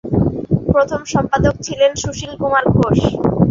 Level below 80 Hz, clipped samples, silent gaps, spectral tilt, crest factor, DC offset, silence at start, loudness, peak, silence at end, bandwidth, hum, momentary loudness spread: -32 dBFS; under 0.1%; none; -6 dB/octave; 14 dB; under 0.1%; 0.05 s; -16 LUFS; 0 dBFS; 0 s; 7.6 kHz; none; 5 LU